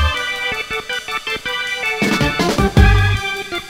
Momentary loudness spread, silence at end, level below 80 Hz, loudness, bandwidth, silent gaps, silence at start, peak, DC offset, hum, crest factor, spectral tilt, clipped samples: 9 LU; 0 s; -22 dBFS; -17 LUFS; 16 kHz; none; 0 s; 0 dBFS; under 0.1%; none; 16 dB; -5 dB/octave; under 0.1%